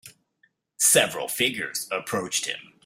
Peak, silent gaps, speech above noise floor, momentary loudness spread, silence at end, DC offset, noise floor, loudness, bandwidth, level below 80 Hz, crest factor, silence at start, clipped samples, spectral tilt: -6 dBFS; none; 41 dB; 11 LU; 0.25 s; under 0.1%; -67 dBFS; -23 LUFS; 16 kHz; -70 dBFS; 22 dB; 0.05 s; under 0.1%; -1 dB/octave